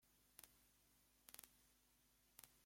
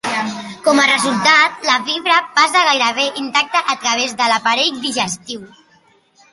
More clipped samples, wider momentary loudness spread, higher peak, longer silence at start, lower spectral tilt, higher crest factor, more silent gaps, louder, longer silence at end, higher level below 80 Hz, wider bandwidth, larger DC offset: neither; second, 6 LU vs 9 LU; second, -30 dBFS vs 0 dBFS; about the same, 0 s vs 0.05 s; about the same, -1 dB/octave vs -1.5 dB/octave; first, 40 dB vs 16 dB; neither; second, -65 LUFS vs -14 LUFS; second, 0 s vs 0.85 s; second, -86 dBFS vs -64 dBFS; first, 16.5 kHz vs 11.5 kHz; neither